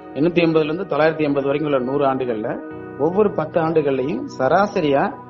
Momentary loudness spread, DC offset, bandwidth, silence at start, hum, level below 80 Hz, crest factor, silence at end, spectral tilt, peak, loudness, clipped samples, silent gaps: 7 LU; under 0.1%; 7.2 kHz; 0 s; none; -54 dBFS; 18 dB; 0 s; -7.5 dB/octave; -2 dBFS; -19 LUFS; under 0.1%; none